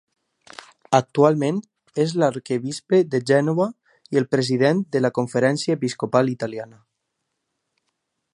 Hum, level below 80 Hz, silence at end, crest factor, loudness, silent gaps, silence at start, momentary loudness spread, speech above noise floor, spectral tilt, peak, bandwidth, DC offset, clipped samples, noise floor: none; -68 dBFS; 1.7 s; 20 dB; -21 LUFS; none; 0.9 s; 8 LU; 57 dB; -6 dB/octave; -2 dBFS; 11 kHz; under 0.1%; under 0.1%; -78 dBFS